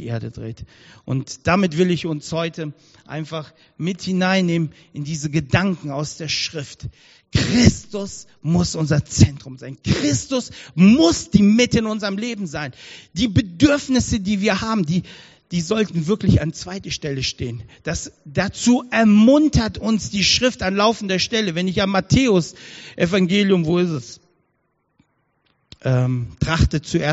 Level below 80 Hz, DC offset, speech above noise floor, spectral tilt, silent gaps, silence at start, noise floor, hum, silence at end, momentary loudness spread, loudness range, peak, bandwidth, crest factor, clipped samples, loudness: -38 dBFS; under 0.1%; 49 dB; -5 dB/octave; none; 0 s; -69 dBFS; none; 0 s; 16 LU; 6 LU; 0 dBFS; 8 kHz; 20 dB; under 0.1%; -19 LUFS